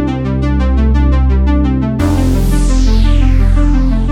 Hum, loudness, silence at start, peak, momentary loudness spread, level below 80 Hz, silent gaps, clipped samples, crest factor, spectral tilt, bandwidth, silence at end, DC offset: none; -13 LUFS; 0 s; 0 dBFS; 2 LU; -12 dBFS; none; under 0.1%; 10 dB; -7.5 dB/octave; 12.5 kHz; 0 s; under 0.1%